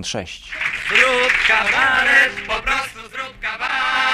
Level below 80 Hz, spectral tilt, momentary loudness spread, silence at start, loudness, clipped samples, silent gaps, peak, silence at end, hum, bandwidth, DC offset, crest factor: -42 dBFS; -1.5 dB/octave; 15 LU; 0 s; -16 LUFS; under 0.1%; none; -2 dBFS; 0 s; none; 15 kHz; under 0.1%; 18 dB